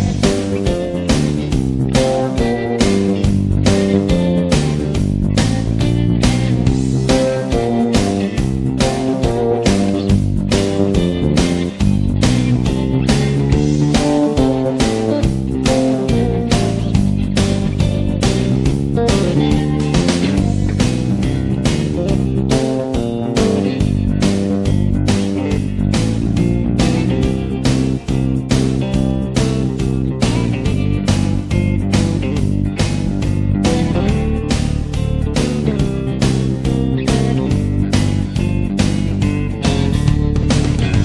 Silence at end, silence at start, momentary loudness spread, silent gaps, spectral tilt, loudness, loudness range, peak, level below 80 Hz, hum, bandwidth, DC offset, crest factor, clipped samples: 0 s; 0 s; 3 LU; none; -6.5 dB/octave; -16 LUFS; 2 LU; 0 dBFS; -24 dBFS; none; 12 kHz; 0.1%; 14 dB; under 0.1%